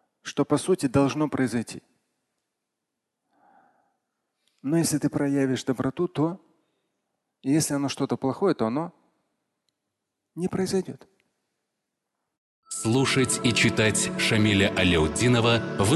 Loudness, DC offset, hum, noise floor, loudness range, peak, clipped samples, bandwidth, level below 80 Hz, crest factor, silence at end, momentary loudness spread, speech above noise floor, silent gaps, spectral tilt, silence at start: -24 LUFS; under 0.1%; none; -83 dBFS; 12 LU; -8 dBFS; under 0.1%; 12.5 kHz; -48 dBFS; 18 dB; 0 s; 12 LU; 59 dB; 12.38-12.63 s; -4.5 dB/octave; 0.25 s